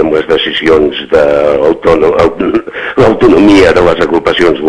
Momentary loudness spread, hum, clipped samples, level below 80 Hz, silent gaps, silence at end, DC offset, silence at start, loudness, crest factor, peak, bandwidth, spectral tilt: 6 LU; none; 6%; -30 dBFS; none; 0 s; under 0.1%; 0 s; -8 LUFS; 8 dB; 0 dBFS; 11 kHz; -6 dB/octave